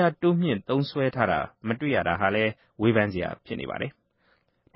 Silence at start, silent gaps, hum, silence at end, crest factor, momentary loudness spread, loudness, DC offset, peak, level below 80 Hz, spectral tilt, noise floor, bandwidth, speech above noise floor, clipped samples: 0 s; none; none; 0.85 s; 20 dB; 10 LU; -26 LUFS; under 0.1%; -6 dBFS; -52 dBFS; -11 dB/octave; -67 dBFS; 5.8 kHz; 42 dB; under 0.1%